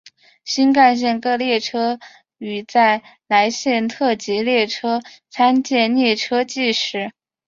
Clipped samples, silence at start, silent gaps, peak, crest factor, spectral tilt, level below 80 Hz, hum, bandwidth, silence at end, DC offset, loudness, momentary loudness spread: under 0.1%; 0.45 s; none; -2 dBFS; 16 dB; -3.5 dB/octave; -66 dBFS; none; 7.6 kHz; 0.4 s; under 0.1%; -18 LUFS; 13 LU